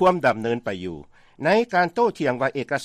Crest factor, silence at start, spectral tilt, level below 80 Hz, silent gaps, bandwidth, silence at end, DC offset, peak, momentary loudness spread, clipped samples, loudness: 16 dB; 0 s; -6 dB/octave; -58 dBFS; none; 13 kHz; 0 s; under 0.1%; -8 dBFS; 12 LU; under 0.1%; -22 LUFS